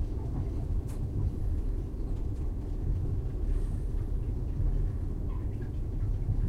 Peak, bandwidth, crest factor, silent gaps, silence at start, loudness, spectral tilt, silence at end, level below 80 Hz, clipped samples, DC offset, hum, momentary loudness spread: -20 dBFS; 3.3 kHz; 12 dB; none; 0 s; -35 LUFS; -9.5 dB/octave; 0 s; -32 dBFS; under 0.1%; under 0.1%; none; 4 LU